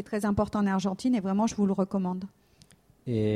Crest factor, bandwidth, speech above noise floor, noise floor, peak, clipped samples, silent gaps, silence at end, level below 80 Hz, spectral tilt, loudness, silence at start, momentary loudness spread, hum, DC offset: 14 dB; 13 kHz; 32 dB; -59 dBFS; -14 dBFS; under 0.1%; none; 0 s; -54 dBFS; -7 dB/octave; -28 LUFS; 0 s; 9 LU; none; under 0.1%